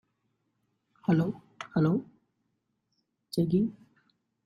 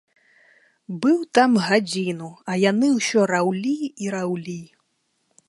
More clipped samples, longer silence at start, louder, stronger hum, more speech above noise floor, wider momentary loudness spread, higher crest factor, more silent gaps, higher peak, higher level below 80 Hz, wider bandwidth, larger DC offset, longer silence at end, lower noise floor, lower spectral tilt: neither; first, 1.1 s vs 0.9 s; second, -30 LUFS vs -21 LUFS; neither; about the same, 52 dB vs 50 dB; second, 8 LU vs 13 LU; about the same, 18 dB vs 20 dB; neither; second, -14 dBFS vs -2 dBFS; about the same, -66 dBFS vs -70 dBFS; first, 13 kHz vs 11.5 kHz; neither; about the same, 0.75 s vs 0.85 s; first, -79 dBFS vs -71 dBFS; first, -8.5 dB/octave vs -5 dB/octave